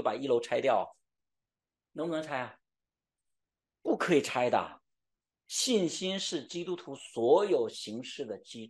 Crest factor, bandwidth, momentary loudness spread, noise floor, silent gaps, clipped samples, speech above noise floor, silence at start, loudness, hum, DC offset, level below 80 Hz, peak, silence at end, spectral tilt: 20 dB; 12.5 kHz; 14 LU; under -90 dBFS; none; under 0.1%; over 59 dB; 0 s; -31 LUFS; none; under 0.1%; -80 dBFS; -12 dBFS; 0 s; -3.5 dB/octave